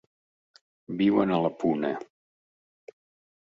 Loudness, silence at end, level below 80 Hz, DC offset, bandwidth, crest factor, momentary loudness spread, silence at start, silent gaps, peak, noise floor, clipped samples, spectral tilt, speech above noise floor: -26 LUFS; 1.35 s; -68 dBFS; under 0.1%; 7.4 kHz; 20 dB; 13 LU; 0.9 s; none; -10 dBFS; under -90 dBFS; under 0.1%; -8 dB/octave; over 65 dB